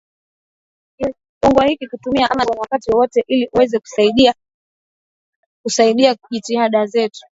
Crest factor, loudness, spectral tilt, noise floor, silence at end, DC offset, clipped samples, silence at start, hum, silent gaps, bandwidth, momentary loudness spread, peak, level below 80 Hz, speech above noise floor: 18 dB; -16 LUFS; -4 dB/octave; under -90 dBFS; 0.15 s; under 0.1%; under 0.1%; 1 s; none; 1.29-1.41 s, 4.54-5.64 s; 8 kHz; 12 LU; 0 dBFS; -48 dBFS; over 75 dB